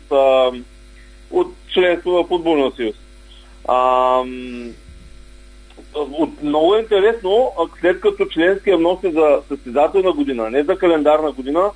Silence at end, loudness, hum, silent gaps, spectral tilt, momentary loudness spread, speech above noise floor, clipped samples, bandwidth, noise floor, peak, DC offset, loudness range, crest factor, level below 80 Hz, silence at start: 0 s; -17 LUFS; none; none; -5.5 dB/octave; 11 LU; 25 dB; under 0.1%; 10.5 kHz; -41 dBFS; 0 dBFS; under 0.1%; 5 LU; 16 dB; -42 dBFS; 0.1 s